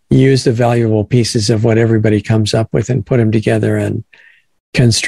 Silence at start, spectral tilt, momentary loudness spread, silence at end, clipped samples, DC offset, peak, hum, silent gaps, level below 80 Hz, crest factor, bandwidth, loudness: 0.1 s; -6 dB/octave; 5 LU; 0 s; under 0.1%; under 0.1%; 0 dBFS; none; 4.60-4.73 s; -42 dBFS; 12 dB; 12 kHz; -13 LUFS